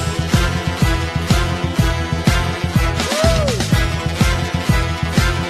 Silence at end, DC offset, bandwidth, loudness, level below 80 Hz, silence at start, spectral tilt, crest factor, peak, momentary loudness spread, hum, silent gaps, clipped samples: 0 s; under 0.1%; 14 kHz; -17 LUFS; -22 dBFS; 0 s; -5 dB/octave; 16 dB; -2 dBFS; 3 LU; none; none; under 0.1%